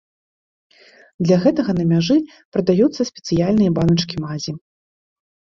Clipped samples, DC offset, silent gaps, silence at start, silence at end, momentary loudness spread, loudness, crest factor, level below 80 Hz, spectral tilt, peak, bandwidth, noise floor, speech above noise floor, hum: under 0.1%; under 0.1%; 2.45-2.52 s; 1.2 s; 1 s; 10 LU; -18 LUFS; 16 dB; -50 dBFS; -7 dB/octave; -4 dBFS; 7.4 kHz; under -90 dBFS; over 73 dB; none